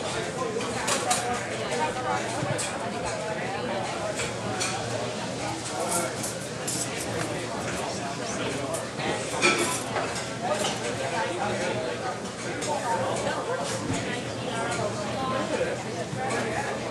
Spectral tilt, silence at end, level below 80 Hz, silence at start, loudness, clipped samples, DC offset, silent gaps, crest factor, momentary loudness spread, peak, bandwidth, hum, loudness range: -3.5 dB/octave; 0 s; -54 dBFS; 0 s; -29 LUFS; under 0.1%; under 0.1%; none; 22 dB; 5 LU; -8 dBFS; 13.5 kHz; none; 3 LU